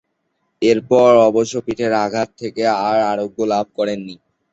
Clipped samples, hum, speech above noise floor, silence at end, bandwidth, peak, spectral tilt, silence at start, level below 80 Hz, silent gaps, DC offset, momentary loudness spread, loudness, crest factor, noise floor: under 0.1%; none; 54 dB; 0.4 s; 8 kHz; -2 dBFS; -5.5 dB/octave; 0.6 s; -58 dBFS; none; under 0.1%; 11 LU; -17 LUFS; 16 dB; -70 dBFS